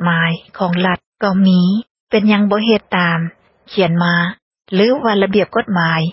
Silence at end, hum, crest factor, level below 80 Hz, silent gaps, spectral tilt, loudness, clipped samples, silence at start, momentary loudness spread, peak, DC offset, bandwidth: 0 s; none; 14 dB; -54 dBFS; 1.06-1.12 s, 1.91-2.07 s, 4.42-4.51 s; -10.5 dB/octave; -15 LUFS; under 0.1%; 0 s; 8 LU; 0 dBFS; under 0.1%; 5.8 kHz